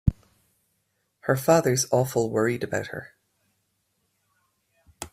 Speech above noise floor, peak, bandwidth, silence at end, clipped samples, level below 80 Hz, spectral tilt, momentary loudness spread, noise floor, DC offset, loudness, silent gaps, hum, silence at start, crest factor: 50 dB; -6 dBFS; 15.5 kHz; 0.05 s; under 0.1%; -44 dBFS; -5 dB/octave; 16 LU; -74 dBFS; under 0.1%; -24 LUFS; none; none; 0.05 s; 22 dB